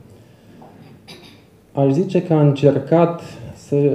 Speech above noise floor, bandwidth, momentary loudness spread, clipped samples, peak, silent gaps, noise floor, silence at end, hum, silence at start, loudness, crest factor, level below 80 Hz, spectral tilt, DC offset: 31 dB; 8.8 kHz; 16 LU; under 0.1%; 0 dBFS; none; -47 dBFS; 0 s; none; 1.1 s; -17 LUFS; 18 dB; -58 dBFS; -9 dB/octave; under 0.1%